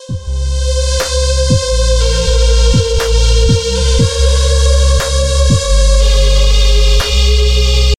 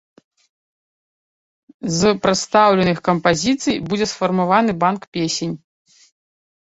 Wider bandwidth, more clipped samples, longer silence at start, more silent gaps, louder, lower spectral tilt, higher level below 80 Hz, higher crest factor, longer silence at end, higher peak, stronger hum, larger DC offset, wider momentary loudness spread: first, 12.5 kHz vs 8.2 kHz; neither; second, 0 s vs 1.85 s; second, none vs 5.07-5.12 s; first, -12 LUFS vs -18 LUFS; about the same, -4 dB/octave vs -4.5 dB/octave; first, -10 dBFS vs -52 dBFS; second, 10 dB vs 18 dB; second, 0.05 s vs 1.1 s; about the same, 0 dBFS vs -2 dBFS; neither; neither; second, 3 LU vs 9 LU